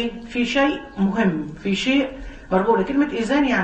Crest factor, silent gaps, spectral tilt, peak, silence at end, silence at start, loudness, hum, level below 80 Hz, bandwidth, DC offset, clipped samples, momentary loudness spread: 16 dB; none; -6 dB/octave; -4 dBFS; 0 s; 0 s; -21 LUFS; none; -42 dBFS; 8.6 kHz; under 0.1%; under 0.1%; 7 LU